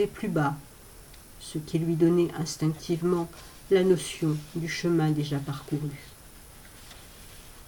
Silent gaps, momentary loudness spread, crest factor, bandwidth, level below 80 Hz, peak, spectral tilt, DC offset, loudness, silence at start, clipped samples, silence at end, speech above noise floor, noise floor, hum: none; 25 LU; 18 dB; 19 kHz; -54 dBFS; -10 dBFS; -6.5 dB/octave; under 0.1%; -28 LUFS; 0 s; under 0.1%; 0 s; 22 dB; -49 dBFS; none